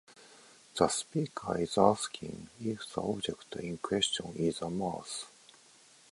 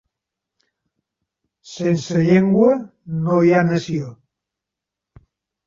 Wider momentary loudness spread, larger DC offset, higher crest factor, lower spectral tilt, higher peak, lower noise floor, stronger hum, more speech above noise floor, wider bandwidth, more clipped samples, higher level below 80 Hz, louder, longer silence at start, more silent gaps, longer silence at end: about the same, 14 LU vs 13 LU; neither; first, 26 dB vs 18 dB; second, -4 dB/octave vs -7.5 dB/octave; second, -8 dBFS vs -4 dBFS; second, -60 dBFS vs -85 dBFS; neither; second, 27 dB vs 68 dB; first, 11.5 kHz vs 7.6 kHz; neither; second, -64 dBFS vs -58 dBFS; second, -33 LUFS vs -18 LUFS; second, 0.1 s vs 1.65 s; neither; second, 0.8 s vs 1.5 s